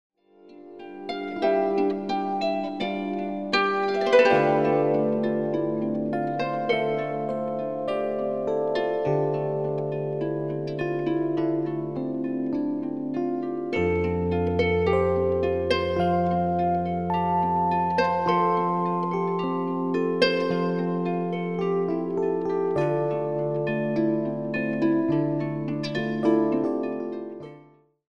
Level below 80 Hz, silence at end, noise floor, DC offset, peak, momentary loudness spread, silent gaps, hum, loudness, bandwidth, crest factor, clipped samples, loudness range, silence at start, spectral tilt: -54 dBFS; 0.55 s; -54 dBFS; 0.2%; -6 dBFS; 7 LU; none; none; -25 LUFS; 9.8 kHz; 20 dB; under 0.1%; 4 LU; 0.45 s; -7.5 dB/octave